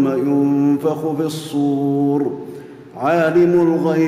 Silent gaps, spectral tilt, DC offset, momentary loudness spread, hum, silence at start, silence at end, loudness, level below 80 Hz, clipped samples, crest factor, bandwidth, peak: none; -7.5 dB/octave; under 0.1%; 13 LU; none; 0 s; 0 s; -17 LUFS; -60 dBFS; under 0.1%; 10 dB; 15 kHz; -6 dBFS